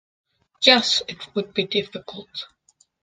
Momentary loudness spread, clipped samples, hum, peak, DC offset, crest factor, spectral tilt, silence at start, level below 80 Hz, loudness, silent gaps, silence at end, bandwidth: 20 LU; under 0.1%; none; 0 dBFS; under 0.1%; 24 dB; -2.5 dB/octave; 0.6 s; -66 dBFS; -20 LUFS; none; 0.55 s; 13 kHz